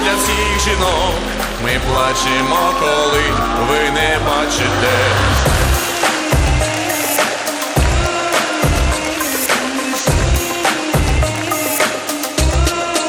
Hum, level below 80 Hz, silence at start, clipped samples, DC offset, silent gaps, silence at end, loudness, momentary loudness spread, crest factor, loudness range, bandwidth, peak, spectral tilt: none; -22 dBFS; 0 s; under 0.1%; under 0.1%; none; 0 s; -15 LUFS; 4 LU; 14 dB; 2 LU; 19.5 kHz; 0 dBFS; -3.5 dB/octave